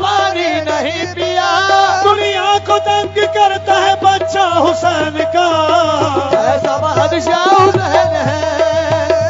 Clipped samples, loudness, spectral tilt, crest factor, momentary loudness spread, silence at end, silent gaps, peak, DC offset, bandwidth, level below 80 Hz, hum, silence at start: under 0.1%; -12 LUFS; -4 dB/octave; 12 dB; 5 LU; 0 s; none; 0 dBFS; under 0.1%; 7.8 kHz; -50 dBFS; none; 0 s